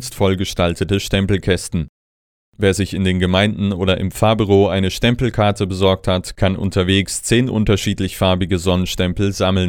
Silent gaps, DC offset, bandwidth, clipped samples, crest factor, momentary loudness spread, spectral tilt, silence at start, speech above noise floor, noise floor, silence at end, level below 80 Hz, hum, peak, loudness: 1.89-2.52 s; under 0.1%; 16.5 kHz; under 0.1%; 16 dB; 4 LU; -5.5 dB/octave; 0 s; over 74 dB; under -90 dBFS; 0 s; -34 dBFS; none; -2 dBFS; -17 LUFS